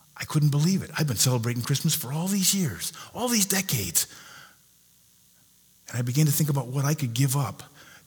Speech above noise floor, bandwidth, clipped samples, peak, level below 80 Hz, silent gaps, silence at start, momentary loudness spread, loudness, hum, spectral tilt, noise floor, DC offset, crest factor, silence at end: 34 dB; over 20 kHz; under 0.1%; -6 dBFS; -62 dBFS; none; 0.15 s; 10 LU; -25 LUFS; 60 Hz at -55 dBFS; -4 dB/octave; -59 dBFS; under 0.1%; 22 dB; 0.25 s